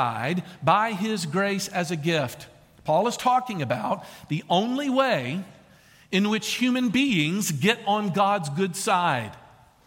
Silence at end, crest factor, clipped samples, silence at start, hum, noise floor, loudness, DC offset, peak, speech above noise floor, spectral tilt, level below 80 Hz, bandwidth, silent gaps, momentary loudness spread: 0.45 s; 18 dB; under 0.1%; 0 s; none; -54 dBFS; -24 LUFS; under 0.1%; -6 dBFS; 30 dB; -4.5 dB/octave; -64 dBFS; 17 kHz; none; 10 LU